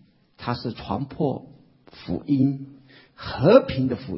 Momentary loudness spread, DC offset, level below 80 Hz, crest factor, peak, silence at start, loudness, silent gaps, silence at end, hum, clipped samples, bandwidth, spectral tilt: 19 LU; under 0.1%; -48 dBFS; 22 dB; -2 dBFS; 0.4 s; -23 LUFS; none; 0 s; none; under 0.1%; 5.8 kHz; -11.5 dB/octave